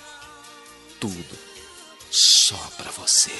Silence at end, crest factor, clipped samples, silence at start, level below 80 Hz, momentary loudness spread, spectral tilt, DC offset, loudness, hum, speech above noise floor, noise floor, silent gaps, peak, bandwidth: 0 s; 20 dB; under 0.1%; 0.05 s; -62 dBFS; 24 LU; 0.5 dB/octave; under 0.1%; -16 LUFS; none; 20 dB; -45 dBFS; none; -2 dBFS; 11.5 kHz